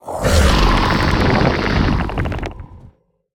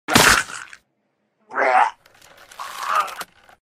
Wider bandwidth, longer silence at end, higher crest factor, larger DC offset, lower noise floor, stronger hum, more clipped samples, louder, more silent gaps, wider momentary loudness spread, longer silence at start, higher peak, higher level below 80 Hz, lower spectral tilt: about the same, 17 kHz vs 16 kHz; about the same, 0.45 s vs 0.4 s; second, 16 dB vs 22 dB; neither; second, -47 dBFS vs -70 dBFS; neither; neither; about the same, -16 LUFS vs -18 LUFS; neither; second, 11 LU vs 22 LU; about the same, 0.05 s vs 0.1 s; about the same, 0 dBFS vs 0 dBFS; first, -22 dBFS vs -46 dBFS; first, -5.5 dB/octave vs -2 dB/octave